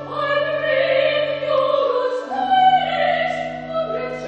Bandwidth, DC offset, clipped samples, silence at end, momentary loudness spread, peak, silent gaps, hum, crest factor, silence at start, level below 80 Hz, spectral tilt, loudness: 8.4 kHz; under 0.1%; under 0.1%; 0 s; 9 LU; -4 dBFS; none; none; 14 dB; 0 s; -56 dBFS; -5 dB/octave; -19 LUFS